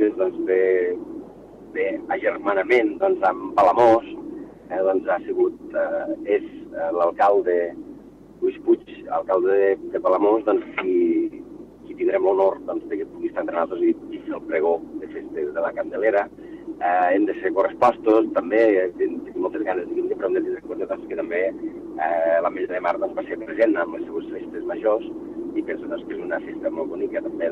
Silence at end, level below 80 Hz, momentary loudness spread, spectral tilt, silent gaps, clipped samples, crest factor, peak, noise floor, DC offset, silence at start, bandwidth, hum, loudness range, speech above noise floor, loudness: 0 s; -60 dBFS; 13 LU; -7 dB/octave; none; under 0.1%; 18 dB; -4 dBFS; -44 dBFS; under 0.1%; 0 s; 6.8 kHz; none; 5 LU; 22 dB; -22 LUFS